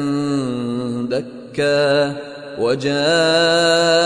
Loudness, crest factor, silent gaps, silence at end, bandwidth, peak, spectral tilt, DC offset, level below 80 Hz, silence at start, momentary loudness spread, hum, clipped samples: -17 LUFS; 14 dB; none; 0 s; 10.5 kHz; -4 dBFS; -4 dB/octave; under 0.1%; -56 dBFS; 0 s; 10 LU; none; under 0.1%